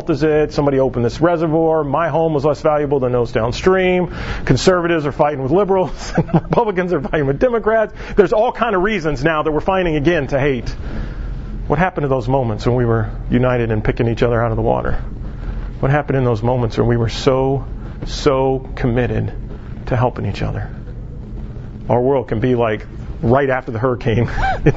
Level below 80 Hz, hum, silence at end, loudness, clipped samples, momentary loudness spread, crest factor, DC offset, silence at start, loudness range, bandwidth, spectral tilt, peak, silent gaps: -28 dBFS; none; 0 s; -17 LUFS; under 0.1%; 13 LU; 16 dB; under 0.1%; 0 s; 4 LU; 8 kHz; -7 dB/octave; 0 dBFS; none